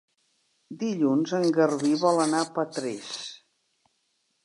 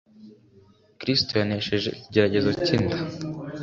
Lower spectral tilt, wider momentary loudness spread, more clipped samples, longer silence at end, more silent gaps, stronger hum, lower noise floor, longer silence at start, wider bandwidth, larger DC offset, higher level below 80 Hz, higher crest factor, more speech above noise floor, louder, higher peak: about the same, -5 dB/octave vs -6 dB/octave; first, 13 LU vs 10 LU; neither; first, 1.1 s vs 0 s; neither; neither; first, -73 dBFS vs -56 dBFS; first, 0.7 s vs 0.2 s; first, 11.5 kHz vs 7.6 kHz; neither; second, -82 dBFS vs -50 dBFS; about the same, 18 dB vs 22 dB; first, 49 dB vs 32 dB; about the same, -26 LUFS vs -24 LUFS; second, -10 dBFS vs -4 dBFS